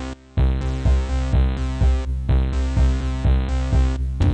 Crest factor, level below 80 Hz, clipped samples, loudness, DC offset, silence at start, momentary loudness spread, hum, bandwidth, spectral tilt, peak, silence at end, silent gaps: 12 dB; -20 dBFS; under 0.1%; -22 LUFS; 0.3%; 0 s; 2 LU; none; 8.4 kHz; -7.5 dB/octave; -8 dBFS; 0 s; none